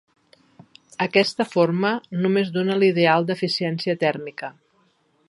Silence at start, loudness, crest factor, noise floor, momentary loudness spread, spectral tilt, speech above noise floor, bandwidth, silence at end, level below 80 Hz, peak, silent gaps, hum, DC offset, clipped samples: 1 s; -21 LUFS; 20 dB; -63 dBFS; 13 LU; -6 dB/octave; 42 dB; 11.5 kHz; 0.8 s; -72 dBFS; -2 dBFS; none; none; under 0.1%; under 0.1%